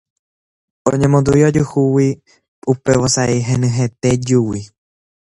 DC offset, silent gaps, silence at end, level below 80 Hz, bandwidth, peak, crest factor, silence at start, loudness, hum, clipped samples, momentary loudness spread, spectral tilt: under 0.1%; 2.48-2.62 s; 0.65 s; -42 dBFS; 11.5 kHz; 0 dBFS; 16 dB; 0.85 s; -15 LUFS; none; under 0.1%; 9 LU; -6 dB/octave